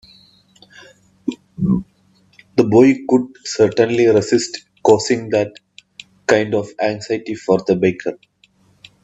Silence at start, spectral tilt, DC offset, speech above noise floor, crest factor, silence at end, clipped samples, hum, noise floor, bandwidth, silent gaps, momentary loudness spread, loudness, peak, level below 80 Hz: 1.25 s; -5.5 dB/octave; under 0.1%; 40 dB; 18 dB; 0.9 s; under 0.1%; none; -56 dBFS; 8.4 kHz; none; 13 LU; -17 LUFS; 0 dBFS; -52 dBFS